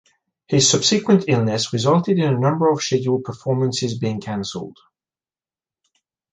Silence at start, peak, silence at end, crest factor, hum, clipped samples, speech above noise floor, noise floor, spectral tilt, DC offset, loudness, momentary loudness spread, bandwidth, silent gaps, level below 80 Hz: 0.5 s; -2 dBFS; 1.6 s; 18 dB; none; under 0.1%; over 71 dB; under -90 dBFS; -4.5 dB/octave; under 0.1%; -19 LUFS; 11 LU; 9.8 kHz; none; -58 dBFS